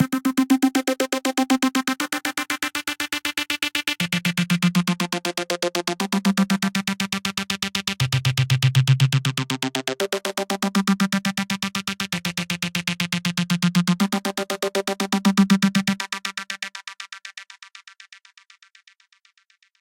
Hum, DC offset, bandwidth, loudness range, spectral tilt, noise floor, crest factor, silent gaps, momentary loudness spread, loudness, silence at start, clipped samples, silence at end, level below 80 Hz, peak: none; under 0.1%; 17 kHz; 3 LU; -4.5 dB/octave; -62 dBFS; 18 dB; none; 7 LU; -22 LUFS; 0 s; under 0.1%; 2 s; -60 dBFS; -4 dBFS